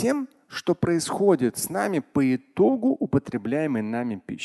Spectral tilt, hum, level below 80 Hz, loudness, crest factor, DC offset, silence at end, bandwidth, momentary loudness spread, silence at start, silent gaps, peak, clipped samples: -5.5 dB/octave; none; -56 dBFS; -24 LUFS; 18 dB; under 0.1%; 0 s; 12.5 kHz; 8 LU; 0 s; none; -6 dBFS; under 0.1%